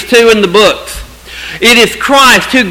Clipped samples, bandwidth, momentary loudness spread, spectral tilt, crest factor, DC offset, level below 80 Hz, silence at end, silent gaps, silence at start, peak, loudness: 3%; over 20 kHz; 19 LU; -2.5 dB/octave; 8 dB; under 0.1%; -32 dBFS; 0 s; none; 0 s; 0 dBFS; -5 LUFS